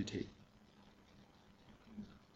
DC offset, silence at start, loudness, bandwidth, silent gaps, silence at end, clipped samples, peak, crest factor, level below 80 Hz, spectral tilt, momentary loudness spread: under 0.1%; 0 s; -50 LUFS; 15.5 kHz; none; 0 s; under 0.1%; -28 dBFS; 24 dB; -70 dBFS; -5 dB/octave; 18 LU